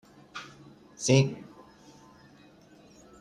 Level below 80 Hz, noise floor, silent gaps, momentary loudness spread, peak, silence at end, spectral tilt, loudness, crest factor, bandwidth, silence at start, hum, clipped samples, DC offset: -66 dBFS; -56 dBFS; none; 26 LU; -10 dBFS; 1.8 s; -5 dB/octave; -26 LUFS; 22 dB; 11 kHz; 0.35 s; none; under 0.1%; under 0.1%